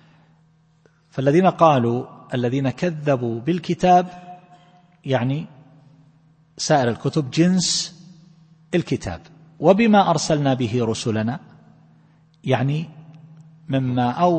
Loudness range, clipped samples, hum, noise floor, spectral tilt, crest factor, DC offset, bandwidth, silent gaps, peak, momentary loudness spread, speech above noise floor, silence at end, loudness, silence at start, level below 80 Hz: 5 LU; under 0.1%; none; -58 dBFS; -5.5 dB/octave; 20 dB; under 0.1%; 8.8 kHz; none; -2 dBFS; 15 LU; 39 dB; 0 s; -20 LUFS; 1.15 s; -54 dBFS